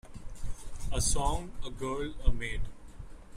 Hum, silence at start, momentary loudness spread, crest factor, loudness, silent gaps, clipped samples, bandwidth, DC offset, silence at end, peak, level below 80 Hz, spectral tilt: none; 0.05 s; 20 LU; 20 dB; -35 LUFS; none; under 0.1%; 15.5 kHz; under 0.1%; 0 s; -12 dBFS; -36 dBFS; -3.5 dB/octave